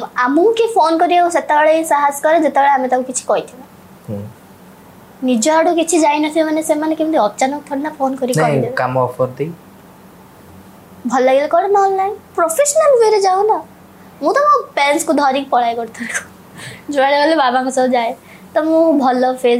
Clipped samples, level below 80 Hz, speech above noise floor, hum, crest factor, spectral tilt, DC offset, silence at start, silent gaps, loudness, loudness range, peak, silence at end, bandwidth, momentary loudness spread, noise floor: under 0.1%; -62 dBFS; 27 dB; none; 12 dB; -4 dB/octave; under 0.1%; 0 s; none; -14 LUFS; 5 LU; -2 dBFS; 0 s; 16 kHz; 11 LU; -41 dBFS